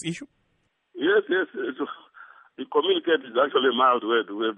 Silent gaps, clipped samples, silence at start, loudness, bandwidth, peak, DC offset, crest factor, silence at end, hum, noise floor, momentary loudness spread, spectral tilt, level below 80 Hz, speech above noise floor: none; under 0.1%; 0 s; -24 LUFS; 9.4 kHz; -8 dBFS; under 0.1%; 16 dB; 0 s; none; -71 dBFS; 14 LU; -4.5 dB/octave; -78 dBFS; 48 dB